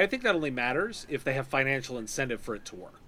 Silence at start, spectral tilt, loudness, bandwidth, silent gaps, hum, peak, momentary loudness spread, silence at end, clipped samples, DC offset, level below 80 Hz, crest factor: 0 s; -4.5 dB/octave; -30 LUFS; 16 kHz; none; none; -10 dBFS; 10 LU; 0 s; under 0.1%; under 0.1%; -54 dBFS; 20 dB